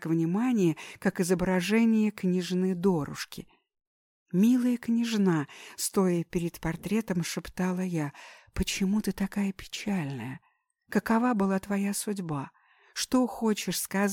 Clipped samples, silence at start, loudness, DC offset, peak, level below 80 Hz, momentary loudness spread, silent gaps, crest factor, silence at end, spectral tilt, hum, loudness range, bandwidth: under 0.1%; 0 s; -28 LUFS; under 0.1%; -12 dBFS; -52 dBFS; 11 LU; 3.87-4.26 s; 16 dB; 0 s; -5.5 dB/octave; none; 4 LU; 17.5 kHz